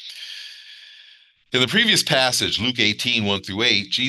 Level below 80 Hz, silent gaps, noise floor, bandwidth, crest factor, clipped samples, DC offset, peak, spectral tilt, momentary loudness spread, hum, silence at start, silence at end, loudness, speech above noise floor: -62 dBFS; none; -52 dBFS; 12.5 kHz; 20 dB; under 0.1%; under 0.1%; -2 dBFS; -2.5 dB/octave; 18 LU; none; 0 s; 0 s; -18 LUFS; 31 dB